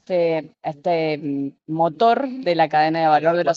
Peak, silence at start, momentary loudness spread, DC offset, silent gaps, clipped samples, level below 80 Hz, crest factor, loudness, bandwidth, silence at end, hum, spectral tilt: -4 dBFS; 0.1 s; 10 LU; under 0.1%; none; under 0.1%; -72 dBFS; 16 dB; -20 LUFS; 7.2 kHz; 0 s; none; -7 dB/octave